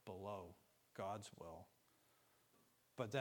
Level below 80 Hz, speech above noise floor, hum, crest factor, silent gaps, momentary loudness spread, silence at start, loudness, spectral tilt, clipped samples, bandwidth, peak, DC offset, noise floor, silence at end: -82 dBFS; 25 dB; none; 26 dB; none; 13 LU; 0.05 s; -52 LUFS; -5.5 dB/octave; under 0.1%; 19 kHz; -28 dBFS; under 0.1%; -77 dBFS; 0 s